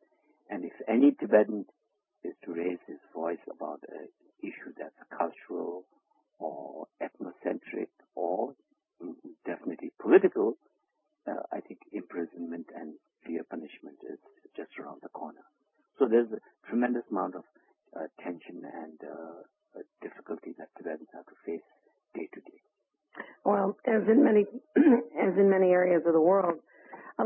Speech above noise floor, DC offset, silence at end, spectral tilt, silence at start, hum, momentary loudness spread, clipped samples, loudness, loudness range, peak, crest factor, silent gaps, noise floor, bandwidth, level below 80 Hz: 49 dB; under 0.1%; 0 s; -11 dB/octave; 0.5 s; none; 22 LU; under 0.1%; -29 LUFS; 18 LU; -8 dBFS; 24 dB; none; -79 dBFS; 3.6 kHz; -80 dBFS